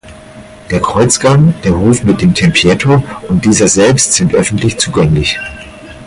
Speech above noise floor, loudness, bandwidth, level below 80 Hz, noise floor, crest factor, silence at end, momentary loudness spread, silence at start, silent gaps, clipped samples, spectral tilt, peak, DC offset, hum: 23 dB; -10 LUFS; 11.5 kHz; -30 dBFS; -33 dBFS; 10 dB; 0 s; 8 LU; 0.05 s; none; under 0.1%; -4.5 dB/octave; 0 dBFS; under 0.1%; none